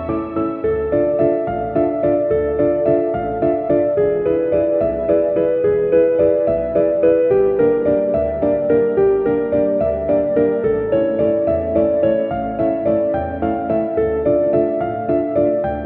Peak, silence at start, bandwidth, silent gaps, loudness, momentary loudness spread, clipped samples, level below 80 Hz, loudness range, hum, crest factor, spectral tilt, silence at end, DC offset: -4 dBFS; 0 s; 3.8 kHz; none; -17 LUFS; 5 LU; under 0.1%; -40 dBFS; 2 LU; none; 12 dB; -8 dB/octave; 0 s; under 0.1%